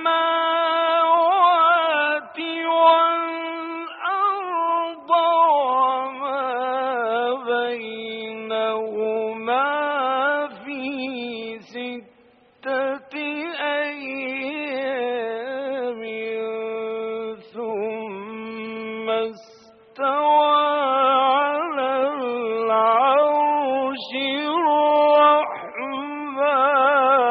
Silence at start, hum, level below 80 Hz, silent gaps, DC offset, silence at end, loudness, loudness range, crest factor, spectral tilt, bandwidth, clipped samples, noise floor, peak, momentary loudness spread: 0 s; none; -76 dBFS; none; under 0.1%; 0 s; -21 LUFS; 10 LU; 18 dB; 0 dB/octave; 5 kHz; under 0.1%; -55 dBFS; -4 dBFS; 14 LU